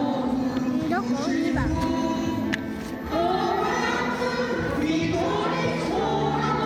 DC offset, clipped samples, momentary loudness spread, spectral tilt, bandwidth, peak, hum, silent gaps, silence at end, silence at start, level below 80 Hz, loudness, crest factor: under 0.1%; under 0.1%; 3 LU; -6 dB/octave; 14 kHz; -8 dBFS; none; none; 0 s; 0 s; -44 dBFS; -25 LUFS; 16 dB